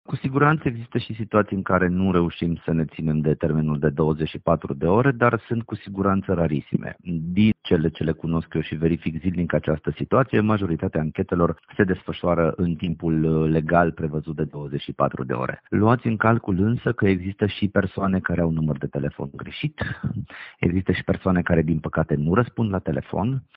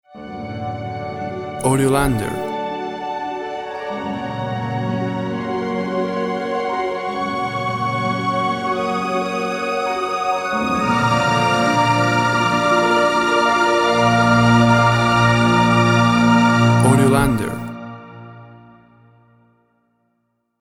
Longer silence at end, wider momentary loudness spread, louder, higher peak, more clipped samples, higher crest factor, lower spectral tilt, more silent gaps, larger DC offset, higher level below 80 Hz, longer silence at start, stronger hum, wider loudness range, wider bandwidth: second, 0.15 s vs 2 s; second, 8 LU vs 13 LU; second, -23 LUFS vs -18 LUFS; about the same, -2 dBFS vs 0 dBFS; neither; about the same, 20 dB vs 18 dB; first, -7 dB/octave vs -5.5 dB/octave; neither; neither; about the same, -44 dBFS vs -42 dBFS; about the same, 0.1 s vs 0.15 s; neither; second, 2 LU vs 10 LU; second, 5 kHz vs 15.5 kHz